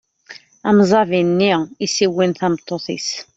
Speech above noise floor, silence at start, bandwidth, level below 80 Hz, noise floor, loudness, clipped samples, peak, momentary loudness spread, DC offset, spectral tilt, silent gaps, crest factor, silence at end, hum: 26 dB; 0.3 s; 8 kHz; -58 dBFS; -42 dBFS; -17 LUFS; under 0.1%; -2 dBFS; 10 LU; under 0.1%; -5 dB/octave; none; 16 dB; 0.15 s; none